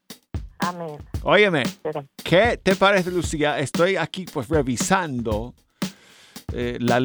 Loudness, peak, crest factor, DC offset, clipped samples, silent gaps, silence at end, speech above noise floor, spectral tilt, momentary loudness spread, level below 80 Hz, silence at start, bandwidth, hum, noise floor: -22 LUFS; -4 dBFS; 18 dB; under 0.1%; under 0.1%; none; 0 s; 24 dB; -4.5 dB/octave; 16 LU; -40 dBFS; 0.1 s; over 20 kHz; none; -45 dBFS